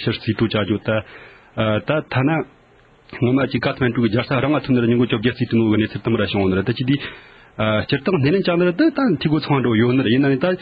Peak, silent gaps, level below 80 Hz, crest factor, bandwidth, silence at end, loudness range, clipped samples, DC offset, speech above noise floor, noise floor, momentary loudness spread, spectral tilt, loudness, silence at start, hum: -4 dBFS; none; -46 dBFS; 14 dB; 5.2 kHz; 0 s; 3 LU; under 0.1%; under 0.1%; 33 dB; -51 dBFS; 7 LU; -10 dB/octave; -19 LUFS; 0 s; none